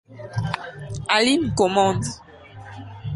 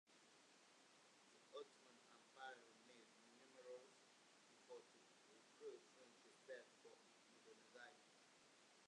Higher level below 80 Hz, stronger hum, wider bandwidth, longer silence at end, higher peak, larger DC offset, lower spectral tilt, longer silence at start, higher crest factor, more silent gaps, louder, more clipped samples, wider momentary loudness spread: first, -46 dBFS vs under -90 dBFS; neither; about the same, 11.5 kHz vs 10.5 kHz; about the same, 0 s vs 0 s; first, -4 dBFS vs -44 dBFS; neither; first, -4.5 dB/octave vs -2 dB/octave; about the same, 0.1 s vs 0.05 s; about the same, 20 dB vs 22 dB; neither; first, -21 LUFS vs -64 LUFS; neither; first, 21 LU vs 9 LU